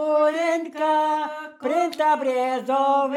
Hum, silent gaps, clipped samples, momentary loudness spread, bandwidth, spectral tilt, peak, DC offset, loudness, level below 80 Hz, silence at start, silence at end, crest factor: none; none; under 0.1%; 6 LU; 15.5 kHz; -3.5 dB/octave; -10 dBFS; under 0.1%; -22 LUFS; -90 dBFS; 0 s; 0 s; 12 dB